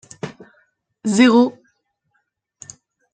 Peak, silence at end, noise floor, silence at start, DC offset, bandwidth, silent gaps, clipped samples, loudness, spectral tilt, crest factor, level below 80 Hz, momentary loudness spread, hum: -2 dBFS; 1.6 s; -70 dBFS; 0.25 s; under 0.1%; 9.4 kHz; none; under 0.1%; -16 LUFS; -4.5 dB/octave; 18 dB; -66 dBFS; 27 LU; none